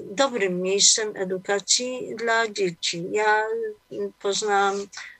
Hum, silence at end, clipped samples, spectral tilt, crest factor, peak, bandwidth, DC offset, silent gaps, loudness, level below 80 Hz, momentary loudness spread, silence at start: none; 0.05 s; under 0.1%; -1.5 dB/octave; 20 dB; -4 dBFS; 11.5 kHz; under 0.1%; none; -23 LUFS; -72 dBFS; 13 LU; 0 s